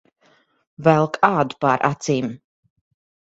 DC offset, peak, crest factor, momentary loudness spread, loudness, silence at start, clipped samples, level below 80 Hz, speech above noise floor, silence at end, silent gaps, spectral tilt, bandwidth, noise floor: under 0.1%; 0 dBFS; 22 dB; 6 LU; -19 LUFS; 0.8 s; under 0.1%; -60 dBFS; 41 dB; 0.9 s; none; -6 dB/octave; 8 kHz; -60 dBFS